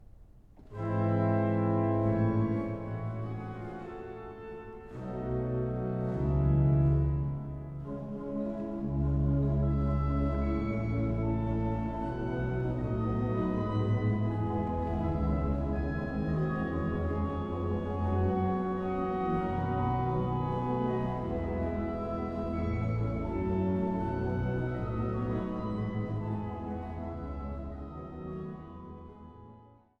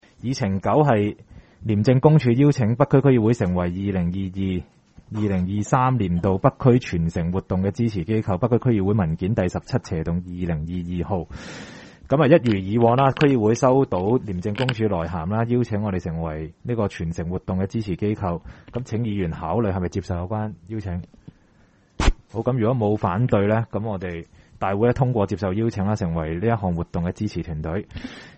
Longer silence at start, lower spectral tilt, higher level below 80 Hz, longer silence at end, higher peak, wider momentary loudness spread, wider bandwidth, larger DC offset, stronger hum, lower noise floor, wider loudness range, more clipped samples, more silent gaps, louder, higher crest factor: second, 0 s vs 0.25 s; first, -10.5 dB/octave vs -8 dB/octave; about the same, -40 dBFS vs -40 dBFS; first, 0.35 s vs 0.05 s; second, -16 dBFS vs -2 dBFS; about the same, 12 LU vs 12 LU; second, 5.4 kHz vs 8.4 kHz; neither; neither; about the same, -56 dBFS vs -57 dBFS; about the same, 6 LU vs 7 LU; neither; neither; second, -32 LUFS vs -22 LUFS; second, 14 dB vs 20 dB